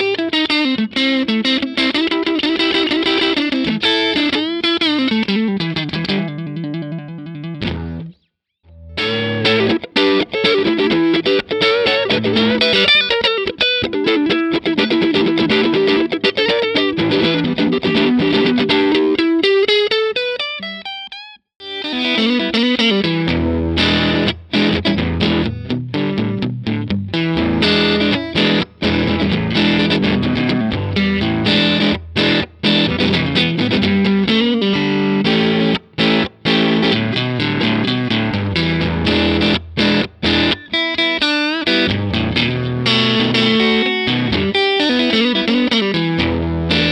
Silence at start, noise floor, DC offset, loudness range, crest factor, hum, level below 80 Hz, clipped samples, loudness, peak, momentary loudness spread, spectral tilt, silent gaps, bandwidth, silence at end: 0 s; -65 dBFS; under 0.1%; 4 LU; 16 dB; none; -38 dBFS; under 0.1%; -15 LUFS; 0 dBFS; 6 LU; -6 dB/octave; 21.56-21.60 s; 10 kHz; 0 s